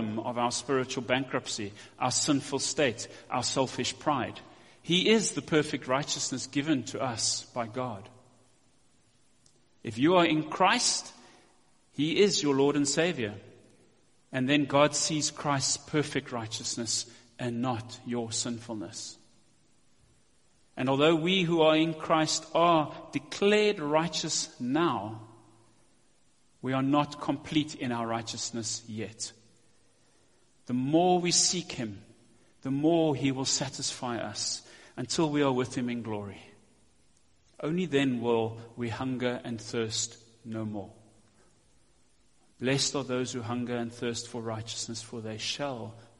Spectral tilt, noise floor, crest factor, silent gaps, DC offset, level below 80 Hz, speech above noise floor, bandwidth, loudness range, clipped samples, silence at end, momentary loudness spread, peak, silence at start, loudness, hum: -3.5 dB/octave; -68 dBFS; 22 dB; none; under 0.1%; -66 dBFS; 39 dB; 11.5 kHz; 8 LU; under 0.1%; 0.15 s; 14 LU; -8 dBFS; 0 s; -29 LUFS; none